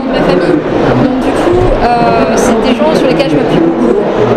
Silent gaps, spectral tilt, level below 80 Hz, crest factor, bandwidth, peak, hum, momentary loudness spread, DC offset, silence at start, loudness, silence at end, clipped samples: none; -6 dB/octave; -24 dBFS; 8 dB; 14.5 kHz; 0 dBFS; none; 2 LU; under 0.1%; 0 s; -9 LUFS; 0 s; 0.4%